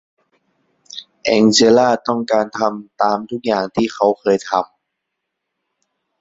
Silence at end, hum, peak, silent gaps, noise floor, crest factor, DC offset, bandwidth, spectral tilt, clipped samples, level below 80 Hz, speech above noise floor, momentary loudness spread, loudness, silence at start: 1.55 s; none; 0 dBFS; none; -77 dBFS; 18 dB; under 0.1%; 8 kHz; -4 dB/octave; under 0.1%; -58 dBFS; 62 dB; 13 LU; -16 LUFS; 0.95 s